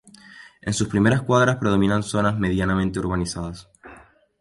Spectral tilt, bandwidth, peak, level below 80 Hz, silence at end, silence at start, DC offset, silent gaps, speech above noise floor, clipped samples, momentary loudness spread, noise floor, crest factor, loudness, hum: -6 dB/octave; 11.5 kHz; -4 dBFS; -42 dBFS; 0.4 s; 0.3 s; under 0.1%; none; 28 dB; under 0.1%; 13 LU; -49 dBFS; 18 dB; -21 LUFS; none